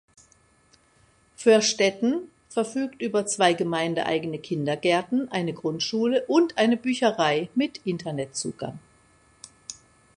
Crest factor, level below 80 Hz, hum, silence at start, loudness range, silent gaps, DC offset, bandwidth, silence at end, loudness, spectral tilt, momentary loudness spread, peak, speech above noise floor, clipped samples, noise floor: 22 dB; -66 dBFS; none; 1.4 s; 2 LU; none; under 0.1%; 11.5 kHz; 0.45 s; -24 LUFS; -4 dB/octave; 11 LU; -4 dBFS; 37 dB; under 0.1%; -61 dBFS